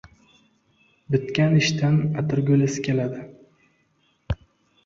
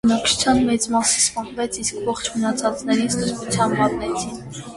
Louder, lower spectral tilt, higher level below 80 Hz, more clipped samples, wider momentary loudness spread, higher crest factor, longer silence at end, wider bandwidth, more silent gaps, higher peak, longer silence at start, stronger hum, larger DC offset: about the same, -22 LUFS vs -20 LUFS; first, -6 dB/octave vs -3 dB/octave; about the same, -46 dBFS vs -46 dBFS; neither; first, 14 LU vs 9 LU; about the same, 16 dB vs 16 dB; first, 0.5 s vs 0 s; second, 7.6 kHz vs 11.5 kHz; neither; second, -8 dBFS vs -4 dBFS; first, 1.1 s vs 0.05 s; neither; neither